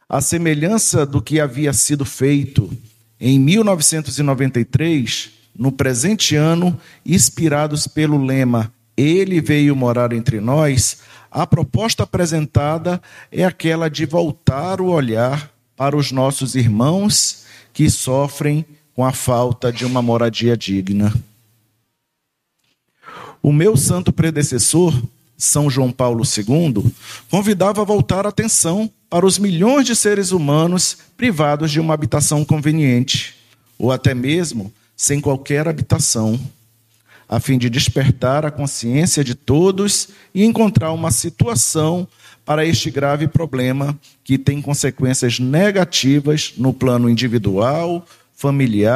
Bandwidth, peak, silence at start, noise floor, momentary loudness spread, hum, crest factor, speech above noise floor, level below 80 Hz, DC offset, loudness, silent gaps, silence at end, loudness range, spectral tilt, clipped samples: 15 kHz; 0 dBFS; 0.1 s; -74 dBFS; 8 LU; none; 16 dB; 58 dB; -44 dBFS; under 0.1%; -16 LUFS; none; 0 s; 3 LU; -5 dB/octave; under 0.1%